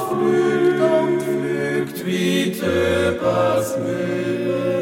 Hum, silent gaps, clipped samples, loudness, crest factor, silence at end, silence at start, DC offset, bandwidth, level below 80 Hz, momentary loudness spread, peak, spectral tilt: none; none; under 0.1%; -20 LUFS; 14 dB; 0 s; 0 s; under 0.1%; 16.5 kHz; -52 dBFS; 6 LU; -6 dBFS; -5.5 dB/octave